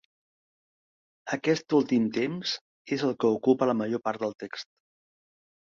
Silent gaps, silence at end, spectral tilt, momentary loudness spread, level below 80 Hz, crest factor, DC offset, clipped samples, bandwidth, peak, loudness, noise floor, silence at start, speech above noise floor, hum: 2.61-2.85 s; 1.15 s; -5.5 dB/octave; 14 LU; -72 dBFS; 20 dB; under 0.1%; under 0.1%; 7.4 kHz; -10 dBFS; -27 LUFS; under -90 dBFS; 1.25 s; over 63 dB; none